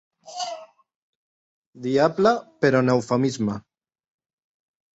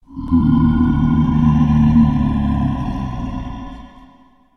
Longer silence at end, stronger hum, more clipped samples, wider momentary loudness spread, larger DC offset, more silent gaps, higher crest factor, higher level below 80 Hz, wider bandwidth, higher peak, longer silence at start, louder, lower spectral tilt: first, 1.35 s vs 0.7 s; neither; neither; about the same, 16 LU vs 14 LU; neither; first, 0.95-1.73 s vs none; first, 20 dB vs 14 dB; second, -62 dBFS vs -26 dBFS; first, 8.2 kHz vs 6.2 kHz; about the same, -4 dBFS vs -2 dBFS; first, 0.25 s vs 0.1 s; second, -22 LUFS vs -16 LUFS; second, -6 dB/octave vs -9.5 dB/octave